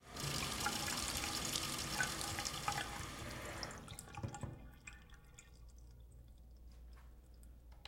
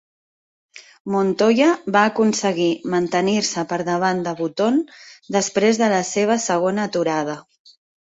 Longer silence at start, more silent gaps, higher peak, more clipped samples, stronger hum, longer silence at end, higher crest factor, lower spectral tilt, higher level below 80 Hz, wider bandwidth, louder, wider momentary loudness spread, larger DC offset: second, 0 s vs 0.75 s; second, none vs 1.00-1.05 s; second, -22 dBFS vs -4 dBFS; neither; neither; second, 0 s vs 0.65 s; first, 24 dB vs 16 dB; second, -2 dB/octave vs -4.5 dB/octave; first, -58 dBFS vs -64 dBFS; first, 16.5 kHz vs 8.2 kHz; second, -41 LUFS vs -19 LUFS; first, 22 LU vs 8 LU; neither